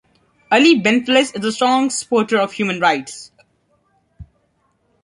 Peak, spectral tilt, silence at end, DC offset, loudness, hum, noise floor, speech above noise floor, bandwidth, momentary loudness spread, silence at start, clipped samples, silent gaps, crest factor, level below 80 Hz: -2 dBFS; -3.5 dB/octave; 0.8 s; under 0.1%; -16 LUFS; none; -64 dBFS; 48 dB; 11.5 kHz; 9 LU; 0.5 s; under 0.1%; none; 18 dB; -56 dBFS